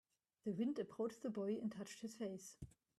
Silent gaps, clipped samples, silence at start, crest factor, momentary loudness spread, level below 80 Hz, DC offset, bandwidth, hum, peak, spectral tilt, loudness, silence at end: none; under 0.1%; 0.45 s; 16 dB; 12 LU; -76 dBFS; under 0.1%; 13 kHz; none; -30 dBFS; -6 dB/octave; -46 LUFS; 0.3 s